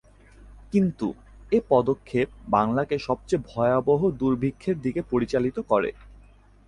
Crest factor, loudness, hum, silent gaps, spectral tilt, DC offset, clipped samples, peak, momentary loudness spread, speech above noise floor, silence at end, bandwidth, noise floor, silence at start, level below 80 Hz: 18 dB; -25 LUFS; none; none; -8 dB/octave; under 0.1%; under 0.1%; -6 dBFS; 6 LU; 29 dB; 0.6 s; 11 kHz; -52 dBFS; 0.4 s; -50 dBFS